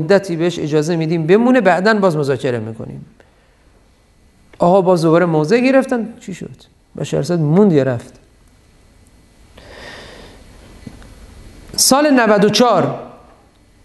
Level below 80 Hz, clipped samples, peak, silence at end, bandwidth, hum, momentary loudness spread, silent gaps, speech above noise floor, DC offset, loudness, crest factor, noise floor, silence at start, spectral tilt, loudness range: -48 dBFS; under 0.1%; 0 dBFS; 0.75 s; 12.5 kHz; none; 20 LU; none; 37 dB; under 0.1%; -14 LUFS; 16 dB; -51 dBFS; 0 s; -5 dB/octave; 4 LU